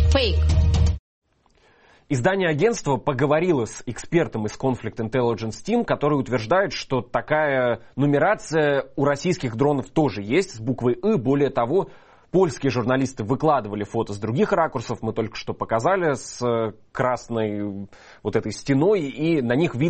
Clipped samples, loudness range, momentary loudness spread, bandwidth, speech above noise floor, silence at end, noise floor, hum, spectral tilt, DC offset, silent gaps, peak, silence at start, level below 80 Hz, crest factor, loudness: under 0.1%; 2 LU; 8 LU; 8.8 kHz; 38 dB; 0 s; -60 dBFS; none; -6.5 dB/octave; under 0.1%; 0.99-1.22 s; -6 dBFS; 0 s; -34 dBFS; 16 dB; -23 LUFS